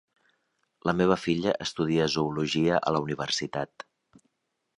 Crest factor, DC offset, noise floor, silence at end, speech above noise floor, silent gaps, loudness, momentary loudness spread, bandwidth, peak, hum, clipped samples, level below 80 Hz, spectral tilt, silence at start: 20 dB; under 0.1%; -80 dBFS; 0.95 s; 53 dB; none; -27 LUFS; 10 LU; 11.5 kHz; -8 dBFS; none; under 0.1%; -58 dBFS; -5 dB/octave; 0.85 s